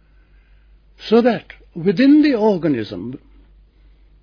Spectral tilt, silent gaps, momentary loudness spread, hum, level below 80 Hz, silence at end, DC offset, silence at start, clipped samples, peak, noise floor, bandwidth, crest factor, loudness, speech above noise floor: -8 dB/octave; none; 21 LU; none; -50 dBFS; 1.05 s; under 0.1%; 1 s; under 0.1%; -2 dBFS; -51 dBFS; 5.4 kHz; 16 dB; -16 LUFS; 35 dB